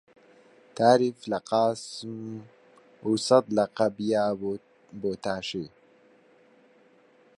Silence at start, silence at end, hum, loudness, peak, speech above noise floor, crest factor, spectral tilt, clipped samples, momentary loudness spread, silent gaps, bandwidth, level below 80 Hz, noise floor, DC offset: 0.75 s; 1.7 s; none; -27 LUFS; -6 dBFS; 34 dB; 22 dB; -5 dB/octave; under 0.1%; 17 LU; none; 11.5 kHz; -68 dBFS; -60 dBFS; under 0.1%